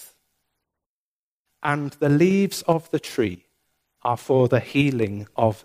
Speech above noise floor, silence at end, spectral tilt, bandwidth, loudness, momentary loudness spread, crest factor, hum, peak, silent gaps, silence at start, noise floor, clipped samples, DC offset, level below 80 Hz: over 69 dB; 0.1 s; -6.5 dB/octave; 15.5 kHz; -22 LUFS; 8 LU; 18 dB; none; -4 dBFS; 0.86-1.45 s; 0 s; under -90 dBFS; under 0.1%; under 0.1%; -62 dBFS